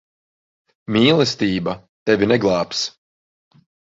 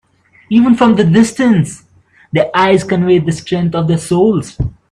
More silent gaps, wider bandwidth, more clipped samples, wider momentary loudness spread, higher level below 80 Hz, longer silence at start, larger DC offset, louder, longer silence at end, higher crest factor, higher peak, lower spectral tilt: first, 1.89-2.06 s vs none; second, 7.8 kHz vs 11.5 kHz; neither; first, 12 LU vs 8 LU; second, -52 dBFS vs -38 dBFS; first, 0.9 s vs 0.5 s; neither; second, -18 LUFS vs -12 LUFS; first, 1.1 s vs 0.2 s; first, 18 dB vs 12 dB; about the same, -2 dBFS vs 0 dBFS; second, -5 dB/octave vs -6.5 dB/octave